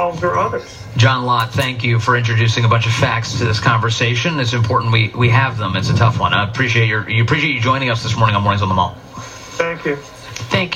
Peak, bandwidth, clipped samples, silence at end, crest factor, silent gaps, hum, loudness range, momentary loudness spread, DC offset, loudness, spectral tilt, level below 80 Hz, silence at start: 0 dBFS; 13.5 kHz; under 0.1%; 0 s; 16 dB; none; none; 2 LU; 8 LU; under 0.1%; -16 LUFS; -5.5 dB/octave; -44 dBFS; 0 s